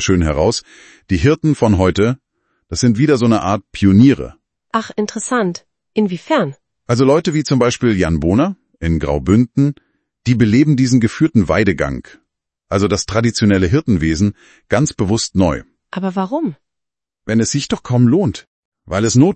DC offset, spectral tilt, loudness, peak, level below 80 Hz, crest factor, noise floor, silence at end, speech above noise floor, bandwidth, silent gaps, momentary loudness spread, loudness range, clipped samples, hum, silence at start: under 0.1%; -6 dB/octave; -15 LUFS; 0 dBFS; -38 dBFS; 16 dB; -84 dBFS; 0 s; 69 dB; 8.8 kHz; 18.47-18.72 s; 10 LU; 4 LU; under 0.1%; none; 0 s